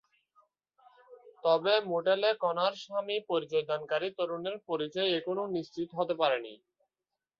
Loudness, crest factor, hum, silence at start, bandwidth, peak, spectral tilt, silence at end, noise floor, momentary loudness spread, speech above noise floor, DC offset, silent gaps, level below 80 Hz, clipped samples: -31 LUFS; 18 dB; none; 1.1 s; 7.2 kHz; -14 dBFS; -5.5 dB/octave; 0.85 s; under -90 dBFS; 8 LU; over 59 dB; under 0.1%; none; -80 dBFS; under 0.1%